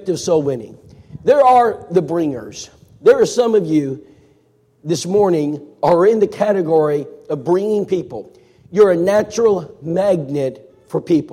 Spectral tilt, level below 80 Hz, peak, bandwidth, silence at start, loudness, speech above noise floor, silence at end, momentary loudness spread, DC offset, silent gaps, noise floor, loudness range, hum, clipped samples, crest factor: -6 dB/octave; -56 dBFS; -2 dBFS; 14 kHz; 0.05 s; -16 LUFS; 41 dB; 0 s; 13 LU; under 0.1%; none; -56 dBFS; 2 LU; none; under 0.1%; 14 dB